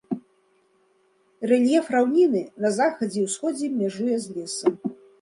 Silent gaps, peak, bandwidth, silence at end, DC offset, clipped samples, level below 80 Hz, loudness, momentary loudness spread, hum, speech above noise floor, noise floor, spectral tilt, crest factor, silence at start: none; -8 dBFS; 11.5 kHz; 0.25 s; under 0.1%; under 0.1%; -74 dBFS; -24 LUFS; 14 LU; none; 41 dB; -64 dBFS; -5 dB/octave; 16 dB; 0.1 s